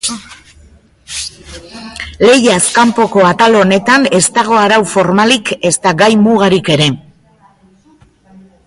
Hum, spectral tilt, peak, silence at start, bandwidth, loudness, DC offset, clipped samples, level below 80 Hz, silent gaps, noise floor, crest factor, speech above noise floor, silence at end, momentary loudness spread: none; -4 dB/octave; 0 dBFS; 0.05 s; 11.5 kHz; -9 LUFS; under 0.1%; under 0.1%; -44 dBFS; none; -47 dBFS; 12 dB; 38 dB; 1.7 s; 17 LU